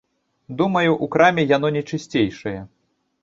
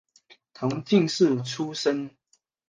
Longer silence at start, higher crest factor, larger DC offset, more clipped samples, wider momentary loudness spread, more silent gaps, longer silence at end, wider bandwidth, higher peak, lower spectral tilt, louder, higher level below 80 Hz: about the same, 0.5 s vs 0.6 s; about the same, 18 dB vs 18 dB; neither; neither; first, 15 LU vs 10 LU; neither; about the same, 0.55 s vs 0.6 s; second, 7.8 kHz vs 9.6 kHz; first, -2 dBFS vs -8 dBFS; about the same, -6.5 dB/octave vs -5.5 dB/octave; first, -19 LUFS vs -25 LUFS; first, -56 dBFS vs -70 dBFS